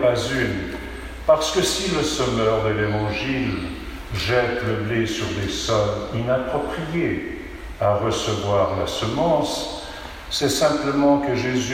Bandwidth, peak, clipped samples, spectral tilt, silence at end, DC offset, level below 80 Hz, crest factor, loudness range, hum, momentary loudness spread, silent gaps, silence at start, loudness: 16.5 kHz; -4 dBFS; under 0.1%; -4.5 dB/octave; 0 s; under 0.1%; -40 dBFS; 18 dB; 2 LU; none; 11 LU; none; 0 s; -22 LUFS